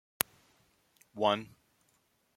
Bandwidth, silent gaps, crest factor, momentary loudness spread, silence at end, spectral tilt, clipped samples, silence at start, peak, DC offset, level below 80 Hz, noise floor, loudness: 16.5 kHz; none; 38 dB; 22 LU; 0.9 s; -2.5 dB/octave; under 0.1%; 1.15 s; 0 dBFS; under 0.1%; -76 dBFS; -73 dBFS; -33 LUFS